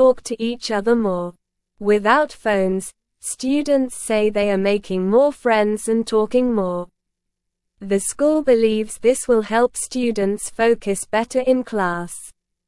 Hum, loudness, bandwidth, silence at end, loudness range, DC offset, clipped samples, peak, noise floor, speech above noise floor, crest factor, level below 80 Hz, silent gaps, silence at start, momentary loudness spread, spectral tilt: none; -19 LUFS; 12 kHz; 0.35 s; 2 LU; under 0.1%; under 0.1%; -2 dBFS; -78 dBFS; 60 dB; 16 dB; -50 dBFS; none; 0 s; 10 LU; -4.5 dB/octave